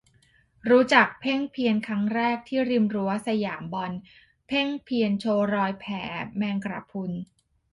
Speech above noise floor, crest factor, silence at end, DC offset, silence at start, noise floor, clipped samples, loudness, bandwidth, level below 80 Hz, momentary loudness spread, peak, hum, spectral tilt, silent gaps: 37 dB; 24 dB; 0.5 s; under 0.1%; 0.65 s; -62 dBFS; under 0.1%; -25 LUFS; 11.5 kHz; -64 dBFS; 13 LU; -2 dBFS; none; -6 dB/octave; none